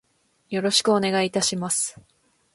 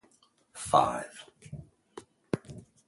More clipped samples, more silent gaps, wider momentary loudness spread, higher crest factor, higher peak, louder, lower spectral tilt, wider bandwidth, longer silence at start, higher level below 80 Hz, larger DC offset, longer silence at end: neither; neither; second, 9 LU vs 25 LU; second, 18 dB vs 26 dB; about the same, -6 dBFS vs -8 dBFS; first, -22 LUFS vs -30 LUFS; second, -3 dB/octave vs -4.5 dB/octave; about the same, 12 kHz vs 11.5 kHz; about the same, 0.5 s vs 0.55 s; about the same, -64 dBFS vs -62 dBFS; neither; first, 0.55 s vs 0.25 s